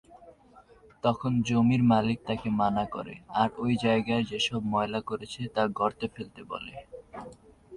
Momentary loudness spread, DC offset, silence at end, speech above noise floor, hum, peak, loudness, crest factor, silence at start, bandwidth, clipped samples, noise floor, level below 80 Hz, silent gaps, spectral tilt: 19 LU; under 0.1%; 0 s; 29 dB; none; -10 dBFS; -28 LUFS; 18 dB; 0.1 s; 10.5 kHz; under 0.1%; -56 dBFS; -58 dBFS; none; -6.5 dB/octave